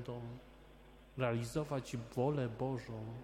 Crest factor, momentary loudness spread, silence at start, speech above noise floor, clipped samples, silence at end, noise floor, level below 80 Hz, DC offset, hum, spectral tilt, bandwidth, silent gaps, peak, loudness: 18 dB; 20 LU; 0 s; 20 dB; under 0.1%; 0 s; -59 dBFS; -62 dBFS; under 0.1%; none; -7 dB/octave; 15.5 kHz; none; -22 dBFS; -40 LUFS